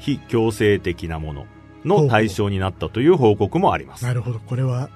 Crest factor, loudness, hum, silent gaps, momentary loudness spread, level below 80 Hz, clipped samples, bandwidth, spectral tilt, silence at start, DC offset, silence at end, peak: 18 dB; -20 LUFS; none; none; 12 LU; -42 dBFS; under 0.1%; 13.5 kHz; -7 dB/octave; 0 s; under 0.1%; 0.05 s; -2 dBFS